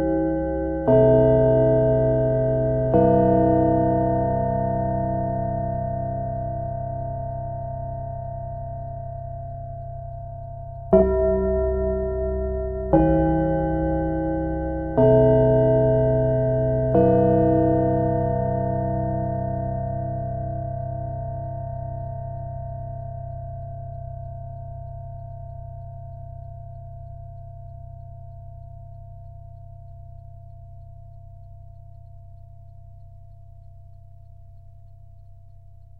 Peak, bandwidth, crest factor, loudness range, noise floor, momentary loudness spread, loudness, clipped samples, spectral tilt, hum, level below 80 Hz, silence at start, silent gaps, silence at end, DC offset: -2 dBFS; 3.2 kHz; 22 dB; 22 LU; -47 dBFS; 23 LU; -22 LUFS; under 0.1%; -13 dB/octave; none; -36 dBFS; 0 s; none; 0.15 s; 0.4%